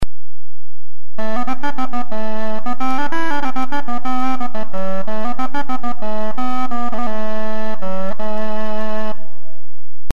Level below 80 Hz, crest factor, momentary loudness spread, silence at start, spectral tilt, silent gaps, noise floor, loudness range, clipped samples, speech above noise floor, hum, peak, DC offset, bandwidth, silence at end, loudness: -44 dBFS; 18 dB; 4 LU; 0 s; -6.5 dB/octave; none; -55 dBFS; 2 LU; under 0.1%; 32 dB; none; -2 dBFS; 50%; 13.5 kHz; 0.5 s; -24 LUFS